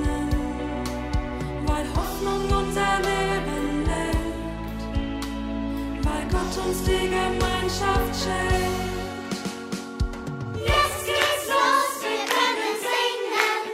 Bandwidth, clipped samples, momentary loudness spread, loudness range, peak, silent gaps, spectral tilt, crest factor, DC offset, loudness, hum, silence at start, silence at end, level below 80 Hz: 16 kHz; under 0.1%; 9 LU; 5 LU; -2 dBFS; none; -4.5 dB/octave; 22 dB; under 0.1%; -25 LUFS; none; 0 s; 0 s; -32 dBFS